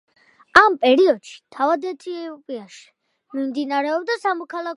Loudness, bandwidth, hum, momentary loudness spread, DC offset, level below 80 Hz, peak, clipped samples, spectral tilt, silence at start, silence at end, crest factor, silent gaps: -19 LUFS; 11.5 kHz; none; 19 LU; under 0.1%; -60 dBFS; 0 dBFS; under 0.1%; -3.5 dB/octave; 0.55 s; 0 s; 20 dB; none